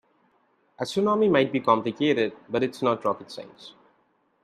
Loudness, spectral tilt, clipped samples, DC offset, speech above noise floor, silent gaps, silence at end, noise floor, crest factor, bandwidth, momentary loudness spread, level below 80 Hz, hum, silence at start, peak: -24 LUFS; -6 dB/octave; under 0.1%; under 0.1%; 43 dB; none; 0.75 s; -67 dBFS; 20 dB; 13.5 kHz; 14 LU; -70 dBFS; none; 0.8 s; -6 dBFS